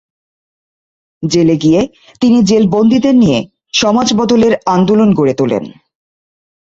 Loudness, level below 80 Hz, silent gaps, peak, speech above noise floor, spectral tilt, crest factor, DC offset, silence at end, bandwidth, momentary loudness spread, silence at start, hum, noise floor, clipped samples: -11 LUFS; -46 dBFS; none; 0 dBFS; over 80 dB; -5.5 dB/octave; 12 dB; under 0.1%; 0.95 s; 7.8 kHz; 8 LU; 1.2 s; none; under -90 dBFS; under 0.1%